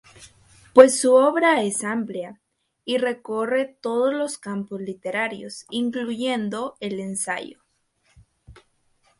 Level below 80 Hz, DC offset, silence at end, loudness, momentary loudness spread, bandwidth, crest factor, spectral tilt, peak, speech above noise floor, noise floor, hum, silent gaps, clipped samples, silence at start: -64 dBFS; under 0.1%; 0.7 s; -22 LUFS; 16 LU; 11.5 kHz; 22 dB; -3.5 dB/octave; 0 dBFS; 45 dB; -67 dBFS; none; none; under 0.1%; 0.2 s